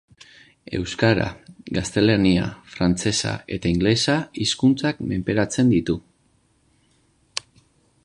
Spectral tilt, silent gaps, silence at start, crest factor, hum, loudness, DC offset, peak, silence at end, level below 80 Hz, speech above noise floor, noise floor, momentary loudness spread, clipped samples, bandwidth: -5 dB/octave; none; 0.7 s; 20 dB; none; -22 LUFS; under 0.1%; -2 dBFS; 0.65 s; -44 dBFS; 42 dB; -63 dBFS; 12 LU; under 0.1%; 11 kHz